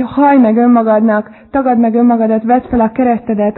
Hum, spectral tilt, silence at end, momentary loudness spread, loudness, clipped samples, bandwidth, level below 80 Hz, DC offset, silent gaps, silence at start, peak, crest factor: none; -12 dB/octave; 0.05 s; 6 LU; -11 LUFS; under 0.1%; 4.1 kHz; -42 dBFS; under 0.1%; none; 0 s; 0 dBFS; 10 dB